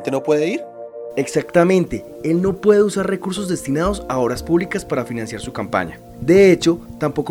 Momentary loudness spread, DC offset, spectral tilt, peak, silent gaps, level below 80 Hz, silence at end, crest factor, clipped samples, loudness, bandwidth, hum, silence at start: 13 LU; under 0.1%; -6 dB/octave; -2 dBFS; none; -42 dBFS; 0 s; 14 dB; under 0.1%; -18 LUFS; 16.5 kHz; none; 0 s